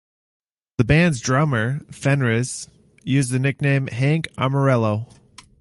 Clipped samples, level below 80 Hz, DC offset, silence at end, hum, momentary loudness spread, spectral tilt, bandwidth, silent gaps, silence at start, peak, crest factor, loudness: under 0.1%; -44 dBFS; under 0.1%; 0.55 s; none; 12 LU; -6 dB/octave; 11.5 kHz; none; 0.8 s; -2 dBFS; 18 dB; -20 LUFS